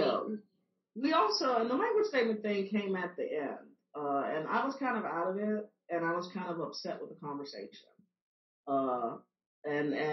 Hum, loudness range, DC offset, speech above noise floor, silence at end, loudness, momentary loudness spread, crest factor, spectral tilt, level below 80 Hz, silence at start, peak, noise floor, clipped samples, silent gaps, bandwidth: none; 7 LU; under 0.1%; 44 dB; 0 s; -34 LUFS; 15 LU; 18 dB; -3.5 dB/octave; under -90 dBFS; 0 s; -18 dBFS; -78 dBFS; under 0.1%; 8.22-8.64 s, 9.46-9.62 s; 6 kHz